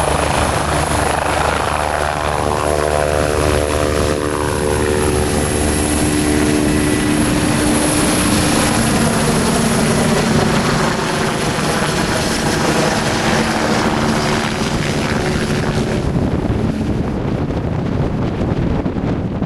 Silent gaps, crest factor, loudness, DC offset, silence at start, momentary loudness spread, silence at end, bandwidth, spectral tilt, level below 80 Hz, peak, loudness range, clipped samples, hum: none; 14 dB; -16 LUFS; under 0.1%; 0 s; 4 LU; 0 s; 14 kHz; -4.5 dB/octave; -28 dBFS; -2 dBFS; 4 LU; under 0.1%; none